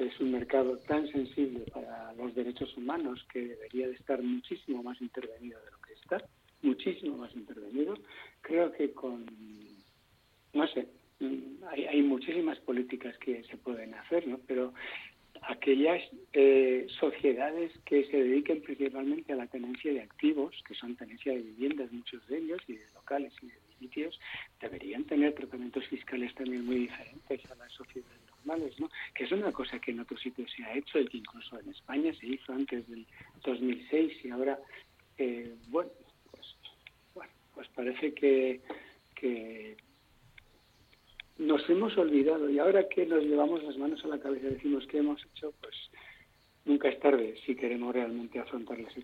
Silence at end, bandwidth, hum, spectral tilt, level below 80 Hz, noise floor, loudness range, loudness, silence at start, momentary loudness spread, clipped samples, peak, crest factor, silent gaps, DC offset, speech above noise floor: 0 s; 6.6 kHz; none; -6.5 dB/octave; -70 dBFS; -67 dBFS; 9 LU; -33 LUFS; 0 s; 20 LU; under 0.1%; -12 dBFS; 22 dB; none; under 0.1%; 34 dB